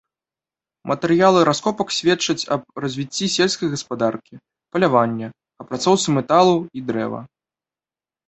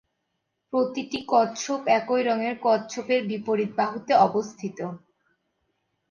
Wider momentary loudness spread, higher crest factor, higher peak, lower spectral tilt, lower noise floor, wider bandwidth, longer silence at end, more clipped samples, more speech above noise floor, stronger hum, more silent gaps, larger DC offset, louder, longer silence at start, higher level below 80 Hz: about the same, 13 LU vs 12 LU; about the same, 20 dB vs 20 dB; first, -2 dBFS vs -6 dBFS; about the same, -4.5 dB/octave vs -4.5 dB/octave; first, under -90 dBFS vs -78 dBFS; first, 8.2 kHz vs 7.4 kHz; second, 1 s vs 1.15 s; neither; first, over 71 dB vs 54 dB; neither; neither; neither; first, -19 LUFS vs -25 LUFS; about the same, 0.85 s vs 0.75 s; first, -60 dBFS vs -72 dBFS